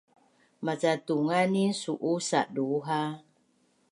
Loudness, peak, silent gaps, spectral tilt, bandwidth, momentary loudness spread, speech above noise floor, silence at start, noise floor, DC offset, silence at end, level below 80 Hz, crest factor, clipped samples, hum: -29 LUFS; -12 dBFS; none; -5 dB/octave; 11.5 kHz; 9 LU; 41 dB; 0.6 s; -69 dBFS; under 0.1%; 0.7 s; -82 dBFS; 18 dB; under 0.1%; none